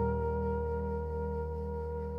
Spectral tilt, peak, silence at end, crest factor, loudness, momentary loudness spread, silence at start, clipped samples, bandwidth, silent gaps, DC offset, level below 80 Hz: -11 dB/octave; -20 dBFS; 0 s; 14 dB; -35 LUFS; 5 LU; 0 s; under 0.1%; 3 kHz; none; under 0.1%; -40 dBFS